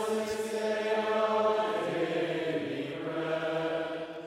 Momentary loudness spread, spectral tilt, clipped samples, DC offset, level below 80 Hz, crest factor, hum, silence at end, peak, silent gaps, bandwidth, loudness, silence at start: 7 LU; -5 dB/octave; under 0.1%; under 0.1%; -72 dBFS; 14 dB; none; 0 s; -16 dBFS; none; 16 kHz; -31 LUFS; 0 s